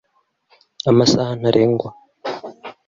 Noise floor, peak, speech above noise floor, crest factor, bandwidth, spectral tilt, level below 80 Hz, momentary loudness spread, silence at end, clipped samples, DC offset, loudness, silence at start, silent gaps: -62 dBFS; -2 dBFS; 46 dB; 18 dB; 7.6 kHz; -6 dB/octave; -52 dBFS; 17 LU; 0.15 s; under 0.1%; under 0.1%; -17 LUFS; 0.85 s; none